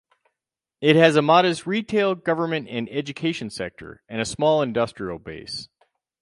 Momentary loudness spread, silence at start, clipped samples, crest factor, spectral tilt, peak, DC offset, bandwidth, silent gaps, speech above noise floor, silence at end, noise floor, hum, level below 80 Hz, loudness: 17 LU; 0.8 s; under 0.1%; 22 dB; -5.5 dB/octave; -2 dBFS; under 0.1%; 11.5 kHz; none; 65 dB; 0.55 s; -86 dBFS; none; -58 dBFS; -22 LUFS